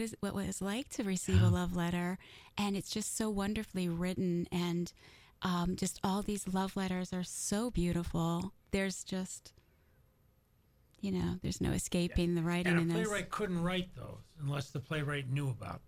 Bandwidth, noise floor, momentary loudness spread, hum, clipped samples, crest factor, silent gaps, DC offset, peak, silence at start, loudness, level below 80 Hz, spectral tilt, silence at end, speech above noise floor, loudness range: 16 kHz; -70 dBFS; 8 LU; none; under 0.1%; 18 dB; none; under 0.1%; -18 dBFS; 0 s; -36 LUFS; -50 dBFS; -5.5 dB/octave; 0 s; 35 dB; 5 LU